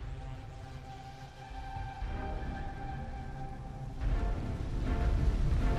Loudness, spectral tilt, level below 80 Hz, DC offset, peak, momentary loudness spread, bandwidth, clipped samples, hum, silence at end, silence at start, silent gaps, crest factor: -39 LUFS; -7.5 dB/octave; -36 dBFS; under 0.1%; -18 dBFS; 14 LU; 8.8 kHz; under 0.1%; none; 0 s; 0 s; none; 16 dB